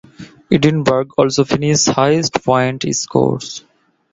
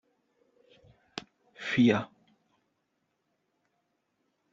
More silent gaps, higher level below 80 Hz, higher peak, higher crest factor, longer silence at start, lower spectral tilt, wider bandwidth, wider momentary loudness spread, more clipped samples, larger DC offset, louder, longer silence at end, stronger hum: neither; first, -48 dBFS vs -72 dBFS; first, 0 dBFS vs -10 dBFS; second, 16 dB vs 24 dB; second, 0.2 s vs 1.15 s; about the same, -4.5 dB/octave vs -5 dB/octave; about the same, 7.8 kHz vs 7.6 kHz; second, 6 LU vs 20 LU; neither; neither; first, -15 LUFS vs -27 LUFS; second, 0.55 s vs 2.45 s; neither